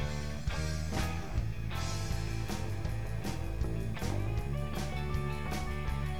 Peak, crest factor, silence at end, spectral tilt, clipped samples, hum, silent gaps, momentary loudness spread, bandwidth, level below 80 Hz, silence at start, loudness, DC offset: -20 dBFS; 14 dB; 0 s; -5.5 dB/octave; under 0.1%; none; none; 2 LU; 19 kHz; -40 dBFS; 0 s; -37 LUFS; 0.9%